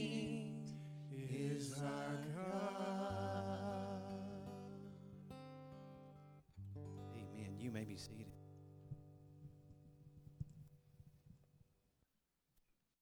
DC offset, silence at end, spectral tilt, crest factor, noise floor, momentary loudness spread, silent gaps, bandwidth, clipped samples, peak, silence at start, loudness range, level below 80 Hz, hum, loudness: under 0.1%; 1.45 s; -6 dB/octave; 18 dB; -87 dBFS; 20 LU; none; 19.5 kHz; under 0.1%; -32 dBFS; 0 s; 17 LU; -72 dBFS; none; -48 LUFS